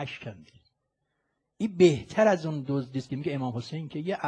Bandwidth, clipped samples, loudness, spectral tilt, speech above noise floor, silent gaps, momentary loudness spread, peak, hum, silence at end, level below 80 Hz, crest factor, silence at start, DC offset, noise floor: 9.6 kHz; under 0.1%; -27 LUFS; -6.5 dB/octave; 52 dB; none; 14 LU; -8 dBFS; none; 0 s; -64 dBFS; 20 dB; 0 s; under 0.1%; -79 dBFS